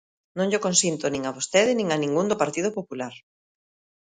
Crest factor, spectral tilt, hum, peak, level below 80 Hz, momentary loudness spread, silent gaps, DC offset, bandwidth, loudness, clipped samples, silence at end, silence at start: 20 dB; -3.5 dB/octave; none; -6 dBFS; -64 dBFS; 14 LU; none; under 0.1%; 10 kHz; -24 LUFS; under 0.1%; 0.85 s; 0.35 s